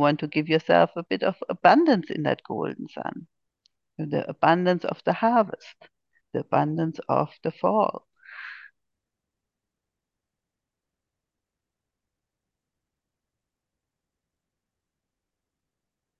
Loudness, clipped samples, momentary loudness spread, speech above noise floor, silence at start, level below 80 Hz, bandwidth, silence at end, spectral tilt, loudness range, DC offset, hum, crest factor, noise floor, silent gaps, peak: -24 LUFS; under 0.1%; 20 LU; 63 dB; 0 s; -74 dBFS; 7 kHz; 7.6 s; -8 dB/octave; 7 LU; under 0.1%; none; 24 dB; -86 dBFS; none; -4 dBFS